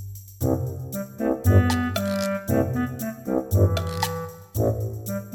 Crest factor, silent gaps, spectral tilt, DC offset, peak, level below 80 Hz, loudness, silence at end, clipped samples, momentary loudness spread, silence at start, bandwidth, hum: 20 dB; none; -6.5 dB/octave; under 0.1%; -4 dBFS; -42 dBFS; -25 LUFS; 0 s; under 0.1%; 12 LU; 0 s; 19 kHz; none